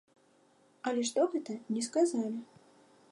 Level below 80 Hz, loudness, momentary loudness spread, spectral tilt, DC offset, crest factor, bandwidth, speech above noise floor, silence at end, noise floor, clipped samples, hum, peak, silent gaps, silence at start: -88 dBFS; -33 LUFS; 9 LU; -4 dB/octave; under 0.1%; 18 dB; 11.5 kHz; 35 dB; 0.7 s; -66 dBFS; under 0.1%; none; -18 dBFS; none; 0.85 s